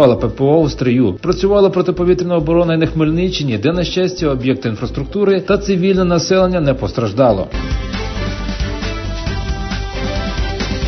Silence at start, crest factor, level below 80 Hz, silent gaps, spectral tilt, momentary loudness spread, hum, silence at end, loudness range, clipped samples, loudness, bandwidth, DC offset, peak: 0 s; 14 dB; -26 dBFS; none; -6.5 dB/octave; 9 LU; none; 0 s; 5 LU; under 0.1%; -16 LUFS; 6.4 kHz; under 0.1%; 0 dBFS